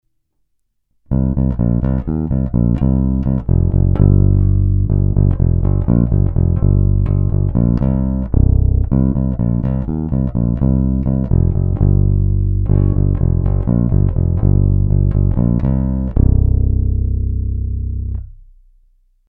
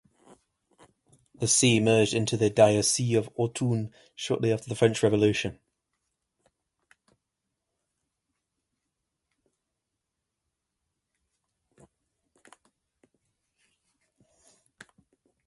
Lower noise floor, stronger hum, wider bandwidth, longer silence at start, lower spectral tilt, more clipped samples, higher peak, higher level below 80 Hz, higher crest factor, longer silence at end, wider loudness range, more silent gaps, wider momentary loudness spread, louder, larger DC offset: second, -66 dBFS vs -84 dBFS; neither; second, 2 kHz vs 12 kHz; second, 1.1 s vs 1.4 s; first, -14 dB/octave vs -4.5 dB/octave; neither; first, 0 dBFS vs -6 dBFS; first, -18 dBFS vs -62 dBFS; second, 14 dB vs 24 dB; second, 0.95 s vs 9.95 s; second, 3 LU vs 7 LU; neither; second, 5 LU vs 11 LU; first, -16 LUFS vs -25 LUFS; neither